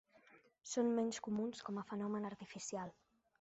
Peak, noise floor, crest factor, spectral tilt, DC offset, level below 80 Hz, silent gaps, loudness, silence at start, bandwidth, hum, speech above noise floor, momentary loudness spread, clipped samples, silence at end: -26 dBFS; -68 dBFS; 16 dB; -5.5 dB/octave; under 0.1%; -82 dBFS; none; -42 LUFS; 0.3 s; 8 kHz; none; 27 dB; 11 LU; under 0.1%; 0.5 s